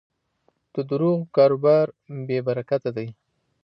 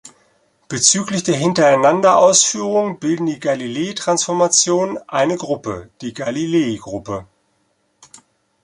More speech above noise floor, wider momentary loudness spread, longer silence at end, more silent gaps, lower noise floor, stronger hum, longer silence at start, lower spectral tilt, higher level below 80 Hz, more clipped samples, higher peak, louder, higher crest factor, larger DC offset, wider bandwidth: about the same, 47 dB vs 48 dB; about the same, 15 LU vs 15 LU; second, 0.5 s vs 1.4 s; neither; first, -68 dBFS vs -64 dBFS; neither; first, 0.75 s vs 0.05 s; first, -10.5 dB/octave vs -3 dB/octave; second, -72 dBFS vs -56 dBFS; neither; second, -6 dBFS vs 0 dBFS; second, -22 LUFS vs -16 LUFS; about the same, 18 dB vs 18 dB; neither; second, 5.8 kHz vs 11.5 kHz